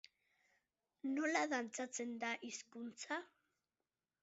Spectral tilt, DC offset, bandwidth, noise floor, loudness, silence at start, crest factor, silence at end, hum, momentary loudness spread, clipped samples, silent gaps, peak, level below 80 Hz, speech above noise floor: -1 dB/octave; under 0.1%; 7.6 kHz; under -90 dBFS; -43 LUFS; 1.05 s; 22 dB; 0.95 s; none; 12 LU; under 0.1%; none; -22 dBFS; under -90 dBFS; over 47 dB